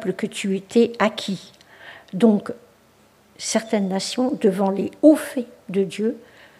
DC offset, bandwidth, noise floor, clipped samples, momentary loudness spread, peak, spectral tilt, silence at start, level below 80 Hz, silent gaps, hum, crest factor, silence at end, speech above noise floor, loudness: under 0.1%; 15 kHz; -55 dBFS; under 0.1%; 17 LU; -2 dBFS; -5 dB/octave; 0 s; -70 dBFS; none; none; 20 dB; 0.4 s; 35 dB; -21 LUFS